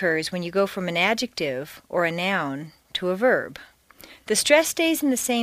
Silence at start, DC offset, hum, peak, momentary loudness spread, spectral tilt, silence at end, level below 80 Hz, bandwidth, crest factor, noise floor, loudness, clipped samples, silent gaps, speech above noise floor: 0 s; under 0.1%; none; -2 dBFS; 13 LU; -3 dB/octave; 0 s; -62 dBFS; 15.5 kHz; 22 dB; -49 dBFS; -23 LUFS; under 0.1%; none; 26 dB